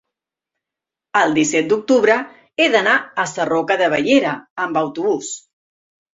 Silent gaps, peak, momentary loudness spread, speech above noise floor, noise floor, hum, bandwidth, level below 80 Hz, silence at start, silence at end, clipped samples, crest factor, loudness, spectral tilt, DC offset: 4.50-4.56 s; -2 dBFS; 9 LU; 69 dB; -86 dBFS; none; 8 kHz; -64 dBFS; 1.15 s; 0.75 s; under 0.1%; 18 dB; -17 LUFS; -3.5 dB/octave; under 0.1%